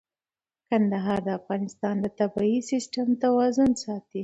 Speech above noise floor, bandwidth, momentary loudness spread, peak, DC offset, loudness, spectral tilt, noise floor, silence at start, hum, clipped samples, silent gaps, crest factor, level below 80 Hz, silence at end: over 65 dB; 8.2 kHz; 8 LU; -12 dBFS; under 0.1%; -26 LUFS; -6 dB/octave; under -90 dBFS; 0.7 s; none; under 0.1%; none; 14 dB; -62 dBFS; 0 s